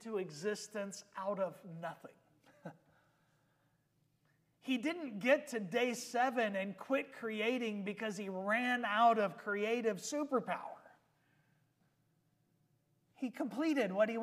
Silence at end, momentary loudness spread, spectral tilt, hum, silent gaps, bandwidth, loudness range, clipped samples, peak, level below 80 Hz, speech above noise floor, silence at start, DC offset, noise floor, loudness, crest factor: 0 s; 14 LU; -4.5 dB/octave; none; none; 15.5 kHz; 12 LU; under 0.1%; -18 dBFS; under -90 dBFS; 41 dB; 0 s; under 0.1%; -77 dBFS; -37 LUFS; 22 dB